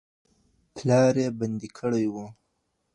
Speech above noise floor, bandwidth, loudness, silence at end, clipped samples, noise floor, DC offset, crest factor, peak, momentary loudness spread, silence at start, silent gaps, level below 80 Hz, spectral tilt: 51 dB; 11 kHz; -25 LUFS; 0.65 s; under 0.1%; -75 dBFS; under 0.1%; 18 dB; -8 dBFS; 20 LU; 0.75 s; none; -64 dBFS; -7 dB/octave